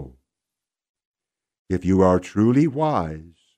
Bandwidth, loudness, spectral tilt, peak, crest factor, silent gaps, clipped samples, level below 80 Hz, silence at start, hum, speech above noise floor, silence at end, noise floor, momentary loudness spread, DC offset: 9.4 kHz; -20 LUFS; -8.5 dB/octave; -4 dBFS; 20 dB; 0.89-0.95 s, 1.05-1.14 s, 1.59-1.65 s; under 0.1%; -48 dBFS; 0 s; none; 68 dB; 0.35 s; -87 dBFS; 12 LU; under 0.1%